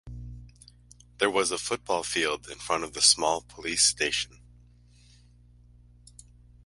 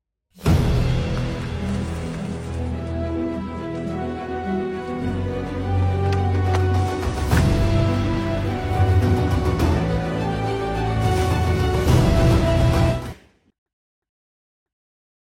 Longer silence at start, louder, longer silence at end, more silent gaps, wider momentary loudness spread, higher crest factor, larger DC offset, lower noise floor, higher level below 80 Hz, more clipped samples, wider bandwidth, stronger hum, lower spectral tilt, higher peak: second, 0.05 s vs 0.4 s; second, -25 LUFS vs -22 LUFS; first, 2.4 s vs 2.2 s; neither; first, 19 LU vs 10 LU; first, 26 dB vs 16 dB; neither; first, -56 dBFS vs -40 dBFS; second, -54 dBFS vs -28 dBFS; neither; second, 11.5 kHz vs 16 kHz; first, 60 Hz at -55 dBFS vs none; second, -1 dB/octave vs -7 dB/octave; about the same, -6 dBFS vs -6 dBFS